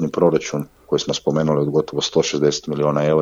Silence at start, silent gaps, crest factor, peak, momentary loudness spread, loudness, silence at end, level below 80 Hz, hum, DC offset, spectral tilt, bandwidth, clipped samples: 0 s; none; 16 dB; -2 dBFS; 6 LU; -20 LUFS; 0 s; -52 dBFS; none; under 0.1%; -5 dB/octave; 14 kHz; under 0.1%